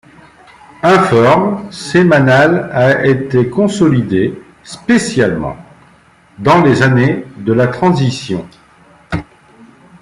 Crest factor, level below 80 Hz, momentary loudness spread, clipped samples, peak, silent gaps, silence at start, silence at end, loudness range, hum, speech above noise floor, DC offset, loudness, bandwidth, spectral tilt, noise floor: 12 dB; -44 dBFS; 15 LU; under 0.1%; 0 dBFS; none; 0.85 s; 0.8 s; 4 LU; none; 35 dB; under 0.1%; -12 LUFS; 11.5 kHz; -6.5 dB/octave; -46 dBFS